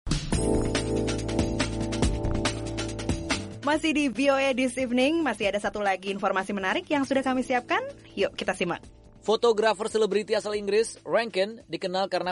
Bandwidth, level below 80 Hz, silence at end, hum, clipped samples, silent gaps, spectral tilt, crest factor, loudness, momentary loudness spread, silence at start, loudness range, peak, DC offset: 11.5 kHz; -40 dBFS; 0 s; none; under 0.1%; none; -4.5 dB/octave; 16 dB; -27 LUFS; 7 LU; 0.05 s; 2 LU; -12 dBFS; under 0.1%